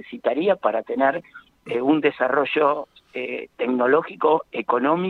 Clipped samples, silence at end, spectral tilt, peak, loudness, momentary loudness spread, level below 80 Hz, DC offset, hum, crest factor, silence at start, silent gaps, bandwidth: under 0.1%; 0 s; -7.5 dB/octave; -4 dBFS; -22 LUFS; 10 LU; -70 dBFS; under 0.1%; none; 18 dB; 0.05 s; none; 4.5 kHz